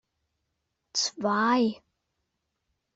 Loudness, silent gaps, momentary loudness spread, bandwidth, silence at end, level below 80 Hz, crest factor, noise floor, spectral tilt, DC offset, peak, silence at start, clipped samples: -26 LUFS; none; 8 LU; 8.2 kHz; 1.2 s; -74 dBFS; 18 dB; -80 dBFS; -3 dB/octave; under 0.1%; -14 dBFS; 0.95 s; under 0.1%